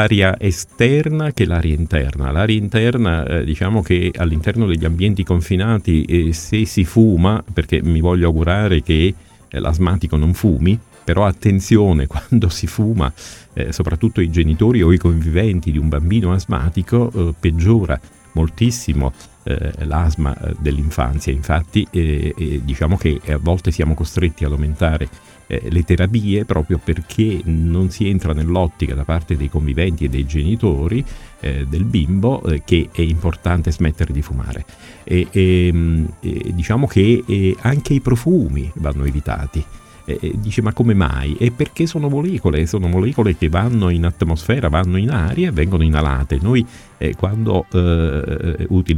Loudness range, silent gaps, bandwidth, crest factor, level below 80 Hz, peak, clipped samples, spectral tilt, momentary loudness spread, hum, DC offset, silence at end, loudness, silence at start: 3 LU; none; 13.5 kHz; 16 dB; -24 dBFS; 0 dBFS; under 0.1%; -7 dB/octave; 8 LU; none; under 0.1%; 0 s; -17 LUFS; 0 s